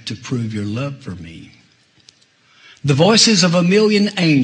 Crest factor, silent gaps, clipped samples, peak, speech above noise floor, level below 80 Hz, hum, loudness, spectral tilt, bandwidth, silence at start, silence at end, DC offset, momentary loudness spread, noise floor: 16 dB; none; under 0.1%; 0 dBFS; 39 dB; -56 dBFS; none; -15 LUFS; -4.5 dB/octave; 10.5 kHz; 0.05 s; 0 s; under 0.1%; 21 LU; -54 dBFS